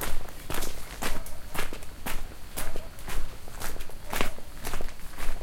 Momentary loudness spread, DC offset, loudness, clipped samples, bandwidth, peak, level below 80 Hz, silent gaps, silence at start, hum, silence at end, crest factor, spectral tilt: 7 LU; under 0.1%; -37 LUFS; under 0.1%; 16.5 kHz; -10 dBFS; -34 dBFS; none; 0 s; none; 0 s; 16 dB; -3 dB/octave